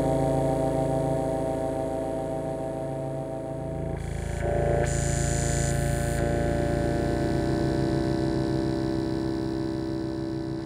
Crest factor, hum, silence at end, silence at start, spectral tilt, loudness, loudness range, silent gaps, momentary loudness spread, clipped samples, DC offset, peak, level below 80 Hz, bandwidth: 14 dB; none; 0 s; 0 s; -6.5 dB/octave; -28 LUFS; 4 LU; none; 7 LU; under 0.1%; under 0.1%; -12 dBFS; -38 dBFS; 15.5 kHz